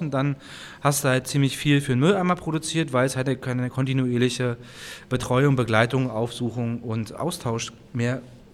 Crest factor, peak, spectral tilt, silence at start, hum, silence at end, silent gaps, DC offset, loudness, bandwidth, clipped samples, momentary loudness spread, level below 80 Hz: 20 dB; -4 dBFS; -5.5 dB/octave; 0 s; none; 0.15 s; none; under 0.1%; -24 LUFS; 15 kHz; under 0.1%; 10 LU; -52 dBFS